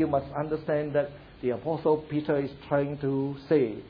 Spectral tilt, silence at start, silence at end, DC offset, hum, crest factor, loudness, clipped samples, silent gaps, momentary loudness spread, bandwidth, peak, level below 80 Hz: -10.5 dB/octave; 0 s; 0 s; under 0.1%; none; 16 dB; -29 LUFS; under 0.1%; none; 5 LU; 5.2 kHz; -12 dBFS; -56 dBFS